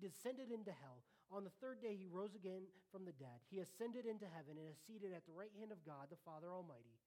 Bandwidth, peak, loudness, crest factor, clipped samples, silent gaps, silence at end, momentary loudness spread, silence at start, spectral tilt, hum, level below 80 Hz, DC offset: 18 kHz; -36 dBFS; -54 LUFS; 18 dB; under 0.1%; none; 0.1 s; 8 LU; 0 s; -6 dB/octave; none; under -90 dBFS; under 0.1%